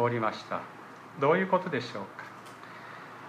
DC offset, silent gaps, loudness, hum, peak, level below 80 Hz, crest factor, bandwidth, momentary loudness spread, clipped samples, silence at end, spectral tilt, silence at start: under 0.1%; none; -30 LUFS; none; -12 dBFS; -78 dBFS; 20 dB; 14.5 kHz; 19 LU; under 0.1%; 0 s; -6.5 dB/octave; 0 s